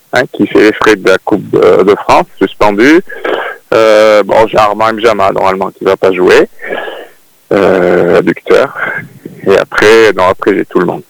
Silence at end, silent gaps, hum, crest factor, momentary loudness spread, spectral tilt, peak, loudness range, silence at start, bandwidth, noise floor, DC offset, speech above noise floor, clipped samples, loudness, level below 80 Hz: 0.1 s; none; none; 8 dB; 10 LU; -5 dB/octave; 0 dBFS; 2 LU; 0.15 s; 20 kHz; -36 dBFS; under 0.1%; 28 dB; 4%; -8 LUFS; -40 dBFS